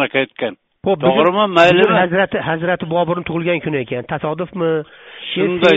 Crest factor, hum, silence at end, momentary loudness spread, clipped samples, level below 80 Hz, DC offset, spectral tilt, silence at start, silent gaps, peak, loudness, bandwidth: 16 dB; none; 0 s; 12 LU; under 0.1%; -52 dBFS; under 0.1%; -3.5 dB/octave; 0 s; none; 0 dBFS; -16 LUFS; 8 kHz